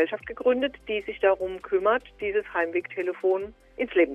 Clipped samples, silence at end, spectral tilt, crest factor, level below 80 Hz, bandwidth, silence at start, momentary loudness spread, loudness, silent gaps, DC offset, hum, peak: under 0.1%; 0 s; -6 dB/octave; 16 dB; -56 dBFS; 4 kHz; 0 s; 7 LU; -27 LUFS; none; under 0.1%; none; -10 dBFS